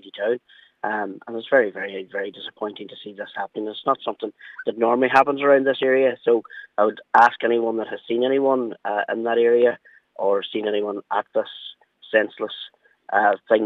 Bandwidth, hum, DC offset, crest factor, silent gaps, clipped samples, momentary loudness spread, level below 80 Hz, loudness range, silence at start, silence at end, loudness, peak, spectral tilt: 7.2 kHz; none; under 0.1%; 20 dB; none; under 0.1%; 15 LU; -76 dBFS; 7 LU; 0.05 s; 0 s; -22 LUFS; -2 dBFS; -6 dB/octave